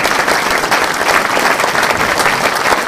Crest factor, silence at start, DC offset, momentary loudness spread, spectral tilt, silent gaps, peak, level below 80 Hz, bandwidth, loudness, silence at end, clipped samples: 14 dB; 0 s; under 0.1%; 1 LU; -2 dB/octave; none; 0 dBFS; -42 dBFS; 16 kHz; -12 LUFS; 0 s; under 0.1%